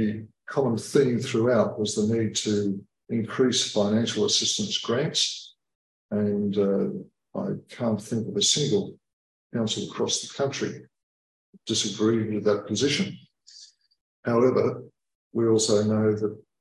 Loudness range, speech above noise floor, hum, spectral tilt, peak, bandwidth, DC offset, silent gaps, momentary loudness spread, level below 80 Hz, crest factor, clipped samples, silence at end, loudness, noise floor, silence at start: 3 LU; 27 dB; none; -4 dB/octave; -8 dBFS; 12 kHz; under 0.1%; 5.75-6.09 s, 9.13-9.50 s, 11.03-11.53 s, 14.01-14.23 s, 15.15-15.31 s; 11 LU; -64 dBFS; 18 dB; under 0.1%; 0.2 s; -25 LUFS; -52 dBFS; 0 s